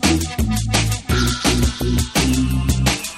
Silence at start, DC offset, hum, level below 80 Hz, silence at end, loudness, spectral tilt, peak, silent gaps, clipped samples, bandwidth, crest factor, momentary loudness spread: 0 s; under 0.1%; none; -24 dBFS; 0 s; -18 LUFS; -4 dB/octave; -2 dBFS; none; under 0.1%; 16.5 kHz; 16 dB; 3 LU